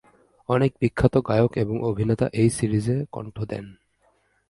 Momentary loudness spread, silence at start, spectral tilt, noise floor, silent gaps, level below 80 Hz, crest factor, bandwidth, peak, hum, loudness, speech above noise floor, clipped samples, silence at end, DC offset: 12 LU; 0.5 s; -7.5 dB/octave; -65 dBFS; none; -46 dBFS; 20 dB; 11.5 kHz; -4 dBFS; none; -23 LUFS; 43 dB; under 0.1%; 0.75 s; under 0.1%